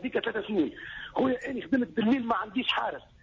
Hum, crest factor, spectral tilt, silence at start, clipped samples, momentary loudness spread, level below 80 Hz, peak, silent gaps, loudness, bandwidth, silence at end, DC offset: none; 14 dB; -6 dB/octave; 0 s; under 0.1%; 7 LU; -60 dBFS; -16 dBFS; none; -29 LUFS; 7.4 kHz; 0.2 s; under 0.1%